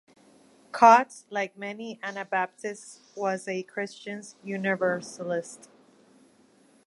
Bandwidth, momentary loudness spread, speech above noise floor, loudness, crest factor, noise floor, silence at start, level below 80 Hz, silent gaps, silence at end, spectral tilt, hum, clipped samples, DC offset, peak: 11.5 kHz; 20 LU; 34 dB; -27 LUFS; 24 dB; -60 dBFS; 0.75 s; -78 dBFS; none; 1.3 s; -4.5 dB/octave; none; under 0.1%; under 0.1%; -4 dBFS